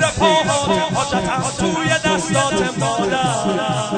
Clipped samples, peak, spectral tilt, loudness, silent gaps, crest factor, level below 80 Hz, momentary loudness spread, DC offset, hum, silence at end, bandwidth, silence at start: under 0.1%; -2 dBFS; -4 dB/octave; -17 LUFS; none; 16 dB; -42 dBFS; 4 LU; under 0.1%; none; 0 s; 9.4 kHz; 0 s